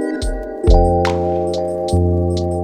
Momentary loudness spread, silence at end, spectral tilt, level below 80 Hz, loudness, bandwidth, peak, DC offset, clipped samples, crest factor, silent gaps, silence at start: 8 LU; 0 s; -7.5 dB/octave; -20 dBFS; -17 LUFS; 10 kHz; 0 dBFS; under 0.1%; under 0.1%; 16 dB; none; 0 s